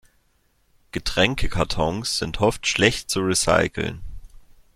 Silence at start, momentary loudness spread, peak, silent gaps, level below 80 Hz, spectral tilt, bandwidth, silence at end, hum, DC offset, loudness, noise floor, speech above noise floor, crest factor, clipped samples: 0.95 s; 11 LU; -2 dBFS; none; -36 dBFS; -3.5 dB/octave; 15.5 kHz; 0.4 s; none; under 0.1%; -22 LUFS; -64 dBFS; 42 dB; 22 dB; under 0.1%